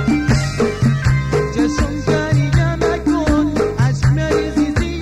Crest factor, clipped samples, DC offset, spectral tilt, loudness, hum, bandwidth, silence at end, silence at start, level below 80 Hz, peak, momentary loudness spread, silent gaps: 14 dB; under 0.1%; 0.6%; -6.5 dB/octave; -16 LUFS; none; 11.5 kHz; 0 s; 0 s; -26 dBFS; -2 dBFS; 3 LU; none